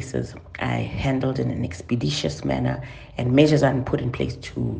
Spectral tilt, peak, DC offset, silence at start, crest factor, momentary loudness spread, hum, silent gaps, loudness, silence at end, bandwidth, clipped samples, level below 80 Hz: -6.5 dB/octave; -4 dBFS; under 0.1%; 0 s; 20 dB; 12 LU; none; none; -23 LUFS; 0 s; 9.6 kHz; under 0.1%; -44 dBFS